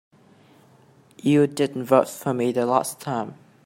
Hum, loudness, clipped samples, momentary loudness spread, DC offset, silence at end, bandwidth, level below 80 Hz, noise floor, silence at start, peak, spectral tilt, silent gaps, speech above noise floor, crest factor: none; -22 LUFS; under 0.1%; 9 LU; under 0.1%; 0.3 s; 16 kHz; -68 dBFS; -55 dBFS; 1.25 s; -4 dBFS; -6 dB/octave; none; 33 dB; 20 dB